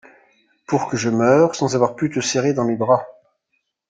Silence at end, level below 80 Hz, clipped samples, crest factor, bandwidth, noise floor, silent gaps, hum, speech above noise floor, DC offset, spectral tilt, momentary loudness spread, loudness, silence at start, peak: 0.8 s; -60 dBFS; under 0.1%; 18 dB; 9.4 kHz; -72 dBFS; none; none; 54 dB; under 0.1%; -5 dB/octave; 7 LU; -19 LUFS; 0.7 s; -2 dBFS